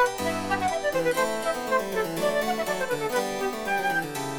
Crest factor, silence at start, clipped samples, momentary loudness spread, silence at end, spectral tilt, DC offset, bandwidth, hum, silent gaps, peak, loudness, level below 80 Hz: 16 dB; 0 s; under 0.1%; 3 LU; 0 s; -3.5 dB/octave; under 0.1%; over 20 kHz; none; none; -10 dBFS; -26 LUFS; -54 dBFS